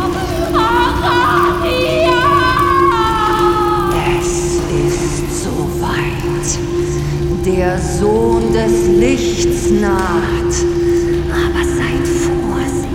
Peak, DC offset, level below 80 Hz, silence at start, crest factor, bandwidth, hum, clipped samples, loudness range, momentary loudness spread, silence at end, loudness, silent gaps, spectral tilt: 0 dBFS; under 0.1%; -26 dBFS; 0 s; 12 dB; 16.5 kHz; none; under 0.1%; 4 LU; 6 LU; 0 s; -14 LUFS; none; -5 dB/octave